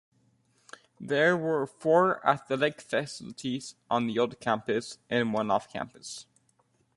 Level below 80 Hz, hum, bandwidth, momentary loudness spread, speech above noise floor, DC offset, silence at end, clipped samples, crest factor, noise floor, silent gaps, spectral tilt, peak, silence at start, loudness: -70 dBFS; none; 11.5 kHz; 14 LU; 41 dB; under 0.1%; 0.75 s; under 0.1%; 22 dB; -70 dBFS; none; -5 dB/octave; -8 dBFS; 1 s; -29 LUFS